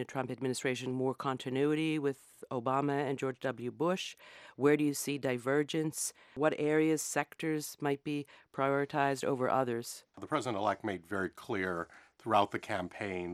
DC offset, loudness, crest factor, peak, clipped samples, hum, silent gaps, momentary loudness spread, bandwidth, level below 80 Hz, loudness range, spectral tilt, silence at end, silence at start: under 0.1%; -34 LUFS; 20 dB; -14 dBFS; under 0.1%; none; none; 9 LU; 15.5 kHz; -76 dBFS; 3 LU; -5 dB/octave; 0 s; 0 s